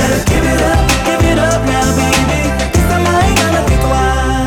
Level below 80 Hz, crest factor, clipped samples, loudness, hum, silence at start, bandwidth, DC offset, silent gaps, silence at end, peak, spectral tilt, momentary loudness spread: -18 dBFS; 8 dB; under 0.1%; -12 LUFS; none; 0 s; 18 kHz; under 0.1%; none; 0 s; -4 dBFS; -5 dB/octave; 2 LU